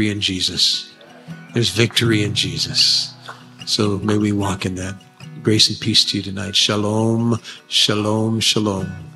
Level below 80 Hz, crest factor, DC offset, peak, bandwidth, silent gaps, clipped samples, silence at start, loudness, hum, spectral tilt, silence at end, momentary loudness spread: -54 dBFS; 18 dB; under 0.1%; 0 dBFS; 14 kHz; none; under 0.1%; 0 s; -17 LUFS; none; -4 dB/octave; 0 s; 14 LU